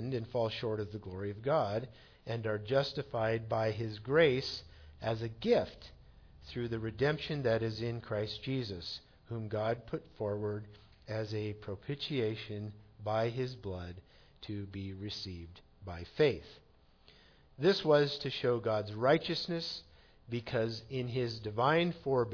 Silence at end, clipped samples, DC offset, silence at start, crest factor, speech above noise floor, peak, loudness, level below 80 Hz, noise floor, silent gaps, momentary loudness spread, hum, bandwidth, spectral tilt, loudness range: 0 s; under 0.1%; under 0.1%; 0 s; 20 dB; 29 dB; -14 dBFS; -35 LUFS; -60 dBFS; -63 dBFS; none; 15 LU; none; 5.4 kHz; -4.5 dB/octave; 7 LU